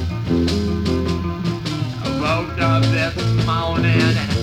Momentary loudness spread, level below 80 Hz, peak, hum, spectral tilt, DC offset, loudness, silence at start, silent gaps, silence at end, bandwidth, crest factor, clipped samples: 7 LU; -34 dBFS; -2 dBFS; none; -6.5 dB/octave; under 0.1%; -19 LUFS; 0 s; none; 0 s; 12.5 kHz; 16 dB; under 0.1%